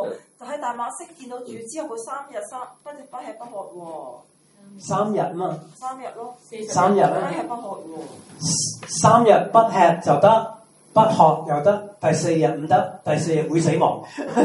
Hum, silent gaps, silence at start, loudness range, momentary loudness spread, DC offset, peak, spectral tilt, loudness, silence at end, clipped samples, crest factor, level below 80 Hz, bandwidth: none; none; 0 s; 16 LU; 21 LU; under 0.1%; 0 dBFS; -5 dB/octave; -19 LUFS; 0 s; under 0.1%; 20 dB; -66 dBFS; 11.5 kHz